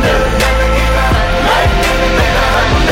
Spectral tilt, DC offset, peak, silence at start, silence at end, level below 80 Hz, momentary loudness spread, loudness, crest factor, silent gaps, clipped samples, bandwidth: -4.5 dB/octave; under 0.1%; -2 dBFS; 0 s; 0 s; -16 dBFS; 1 LU; -11 LUFS; 8 dB; none; under 0.1%; 16.5 kHz